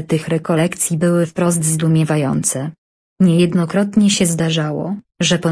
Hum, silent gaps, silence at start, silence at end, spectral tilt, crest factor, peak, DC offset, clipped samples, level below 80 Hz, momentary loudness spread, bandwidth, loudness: none; 2.78-3.16 s; 0 s; 0 s; -5 dB/octave; 14 dB; -2 dBFS; under 0.1%; under 0.1%; -52 dBFS; 6 LU; 11 kHz; -16 LUFS